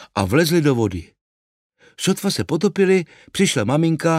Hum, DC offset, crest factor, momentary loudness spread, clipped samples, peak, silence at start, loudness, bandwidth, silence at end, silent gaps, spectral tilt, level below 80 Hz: none; under 0.1%; 16 dB; 8 LU; under 0.1%; -2 dBFS; 0 s; -19 LUFS; 16 kHz; 0 s; 1.21-1.70 s; -5 dB/octave; -52 dBFS